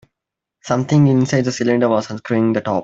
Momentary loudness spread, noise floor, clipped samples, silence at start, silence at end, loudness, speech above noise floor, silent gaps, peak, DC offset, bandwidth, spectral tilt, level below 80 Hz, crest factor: 7 LU; -83 dBFS; under 0.1%; 0.65 s; 0 s; -17 LUFS; 67 dB; none; -2 dBFS; under 0.1%; 8 kHz; -7 dB/octave; -56 dBFS; 14 dB